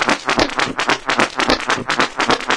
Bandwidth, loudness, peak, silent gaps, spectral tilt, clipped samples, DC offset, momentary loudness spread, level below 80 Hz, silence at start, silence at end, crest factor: 11 kHz; -17 LUFS; 0 dBFS; none; -2.5 dB/octave; under 0.1%; 0.3%; 2 LU; -40 dBFS; 0 s; 0 s; 18 dB